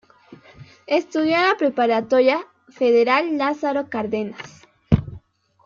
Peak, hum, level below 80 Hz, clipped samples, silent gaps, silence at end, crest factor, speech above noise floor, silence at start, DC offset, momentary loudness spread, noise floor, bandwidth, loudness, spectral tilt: -2 dBFS; none; -46 dBFS; under 0.1%; none; 0.5 s; 18 dB; 28 dB; 0.3 s; under 0.1%; 10 LU; -47 dBFS; 7.2 kHz; -20 LUFS; -6.5 dB/octave